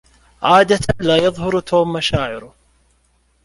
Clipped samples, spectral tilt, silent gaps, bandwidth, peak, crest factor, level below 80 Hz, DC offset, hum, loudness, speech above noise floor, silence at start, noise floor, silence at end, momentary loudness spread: under 0.1%; -5 dB/octave; none; 11.5 kHz; -2 dBFS; 16 dB; -40 dBFS; under 0.1%; none; -16 LUFS; 44 dB; 0.4 s; -59 dBFS; 1 s; 9 LU